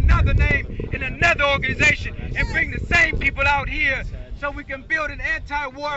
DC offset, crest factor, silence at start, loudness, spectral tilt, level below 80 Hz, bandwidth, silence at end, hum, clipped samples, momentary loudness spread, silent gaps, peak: under 0.1%; 12 dB; 0 s; -20 LUFS; -5 dB/octave; -26 dBFS; 8 kHz; 0 s; none; under 0.1%; 12 LU; none; -8 dBFS